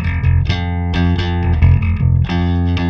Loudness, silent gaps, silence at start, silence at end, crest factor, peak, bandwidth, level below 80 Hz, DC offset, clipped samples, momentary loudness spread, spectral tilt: -15 LUFS; none; 0 s; 0 s; 14 dB; 0 dBFS; 6.2 kHz; -22 dBFS; under 0.1%; under 0.1%; 5 LU; -8 dB/octave